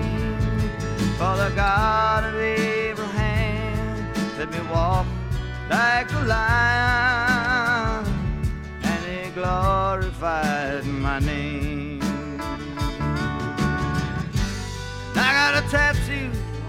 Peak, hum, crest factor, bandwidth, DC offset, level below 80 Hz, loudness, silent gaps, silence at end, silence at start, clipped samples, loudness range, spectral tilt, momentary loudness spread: -6 dBFS; none; 18 dB; 16 kHz; under 0.1%; -32 dBFS; -23 LUFS; none; 0 s; 0 s; under 0.1%; 5 LU; -5.5 dB/octave; 10 LU